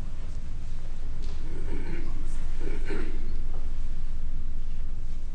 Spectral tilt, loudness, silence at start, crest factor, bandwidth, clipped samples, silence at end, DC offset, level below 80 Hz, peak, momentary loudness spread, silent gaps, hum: -6.5 dB/octave; -37 LUFS; 0 s; 8 dB; 3 kHz; under 0.1%; 0 s; under 0.1%; -26 dBFS; -14 dBFS; 5 LU; none; none